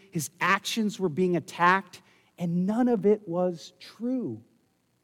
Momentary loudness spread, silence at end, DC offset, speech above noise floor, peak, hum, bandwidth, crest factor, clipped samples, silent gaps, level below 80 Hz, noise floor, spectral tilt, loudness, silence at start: 13 LU; 0.65 s; under 0.1%; 42 dB; -8 dBFS; none; 17.5 kHz; 20 dB; under 0.1%; none; -76 dBFS; -69 dBFS; -5.5 dB/octave; -27 LUFS; 0.15 s